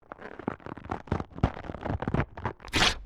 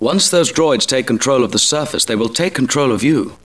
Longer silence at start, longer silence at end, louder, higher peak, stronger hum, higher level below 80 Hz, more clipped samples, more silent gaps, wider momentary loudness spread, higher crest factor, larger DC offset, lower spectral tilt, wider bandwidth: about the same, 0.1 s vs 0 s; about the same, 0 s vs 0.1 s; second, -32 LUFS vs -14 LUFS; second, -8 dBFS vs -2 dBFS; neither; first, -42 dBFS vs -52 dBFS; neither; neither; first, 12 LU vs 4 LU; first, 22 dB vs 12 dB; second, under 0.1% vs 0.4%; about the same, -4 dB/octave vs -3.5 dB/octave; first, 16.5 kHz vs 11 kHz